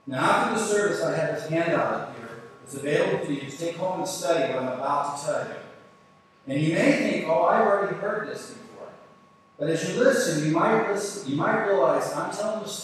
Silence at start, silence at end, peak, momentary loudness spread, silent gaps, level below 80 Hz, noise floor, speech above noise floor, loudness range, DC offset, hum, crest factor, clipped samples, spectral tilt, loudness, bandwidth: 0.05 s; 0 s; -8 dBFS; 16 LU; none; -76 dBFS; -56 dBFS; 32 dB; 4 LU; under 0.1%; none; 18 dB; under 0.1%; -5 dB/octave; -25 LUFS; 14 kHz